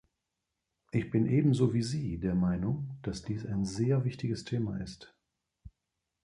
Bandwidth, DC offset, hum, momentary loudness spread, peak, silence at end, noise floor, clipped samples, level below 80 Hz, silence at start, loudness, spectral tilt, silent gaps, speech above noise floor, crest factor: 11 kHz; under 0.1%; none; 11 LU; -14 dBFS; 0.55 s; -86 dBFS; under 0.1%; -54 dBFS; 0.95 s; -32 LUFS; -7.5 dB/octave; none; 55 dB; 18 dB